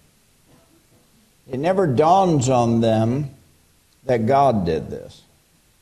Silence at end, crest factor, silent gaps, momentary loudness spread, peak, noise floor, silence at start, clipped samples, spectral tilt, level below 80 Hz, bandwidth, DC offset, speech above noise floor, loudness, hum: 0.75 s; 16 dB; none; 17 LU; -4 dBFS; -58 dBFS; 1.5 s; under 0.1%; -7 dB/octave; -50 dBFS; 13 kHz; under 0.1%; 40 dB; -19 LUFS; none